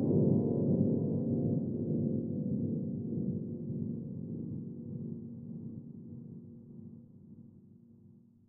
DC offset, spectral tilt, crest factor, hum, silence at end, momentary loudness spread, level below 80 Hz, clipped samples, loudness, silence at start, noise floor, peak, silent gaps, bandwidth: under 0.1%; -16.5 dB/octave; 18 dB; none; 0.4 s; 21 LU; -66 dBFS; under 0.1%; -35 LUFS; 0 s; -60 dBFS; -16 dBFS; none; 1.3 kHz